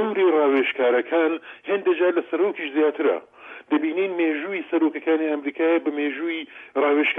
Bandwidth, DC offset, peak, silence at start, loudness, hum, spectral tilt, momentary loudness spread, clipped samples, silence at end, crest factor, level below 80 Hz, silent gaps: 3.8 kHz; under 0.1%; -10 dBFS; 0 s; -22 LUFS; none; -7 dB/octave; 8 LU; under 0.1%; 0 s; 12 dB; -78 dBFS; none